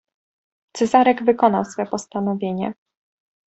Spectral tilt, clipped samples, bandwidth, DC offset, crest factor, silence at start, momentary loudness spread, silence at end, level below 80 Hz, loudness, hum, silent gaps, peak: -6 dB/octave; under 0.1%; 8.4 kHz; under 0.1%; 20 dB; 0.75 s; 11 LU; 0.75 s; -64 dBFS; -20 LUFS; none; none; -2 dBFS